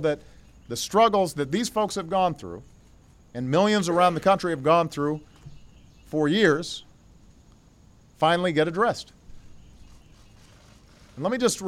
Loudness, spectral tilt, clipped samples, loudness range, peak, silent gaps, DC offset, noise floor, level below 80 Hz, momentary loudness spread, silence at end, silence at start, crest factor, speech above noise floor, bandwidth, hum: -24 LUFS; -4.5 dB/octave; under 0.1%; 4 LU; -8 dBFS; none; under 0.1%; -54 dBFS; -54 dBFS; 15 LU; 0 s; 0 s; 18 dB; 31 dB; 16 kHz; none